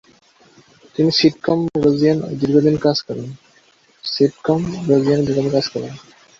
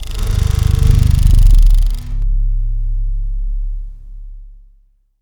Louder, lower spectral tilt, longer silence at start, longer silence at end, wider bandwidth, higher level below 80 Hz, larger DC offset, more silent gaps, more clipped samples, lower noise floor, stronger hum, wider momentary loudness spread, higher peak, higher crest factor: about the same, -17 LUFS vs -17 LUFS; about the same, -6.5 dB/octave vs -6 dB/octave; first, 1 s vs 0 s; second, 0.4 s vs 0.7 s; second, 7.6 kHz vs 17 kHz; second, -52 dBFS vs -14 dBFS; neither; neither; second, under 0.1% vs 0.2%; about the same, -54 dBFS vs -51 dBFS; neither; second, 14 LU vs 19 LU; about the same, -2 dBFS vs 0 dBFS; first, 18 dB vs 12 dB